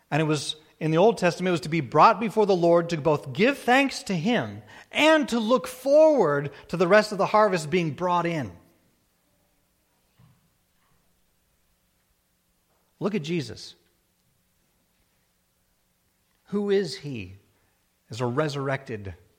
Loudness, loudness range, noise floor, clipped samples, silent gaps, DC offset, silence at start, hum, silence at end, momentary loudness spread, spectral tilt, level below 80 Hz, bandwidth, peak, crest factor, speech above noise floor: -23 LUFS; 14 LU; -70 dBFS; under 0.1%; none; under 0.1%; 0.1 s; none; 0.25 s; 17 LU; -5.5 dB/octave; -64 dBFS; 16.5 kHz; -4 dBFS; 22 dB; 47 dB